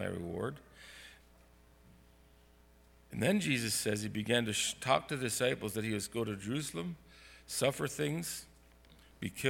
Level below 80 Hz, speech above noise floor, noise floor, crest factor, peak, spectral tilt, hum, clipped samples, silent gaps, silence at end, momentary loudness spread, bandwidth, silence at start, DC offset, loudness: -64 dBFS; 28 dB; -63 dBFS; 24 dB; -14 dBFS; -4 dB/octave; none; under 0.1%; none; 0 s; 20 LU; 19 kHz; 0 s; under 0.1%; -35 LUFS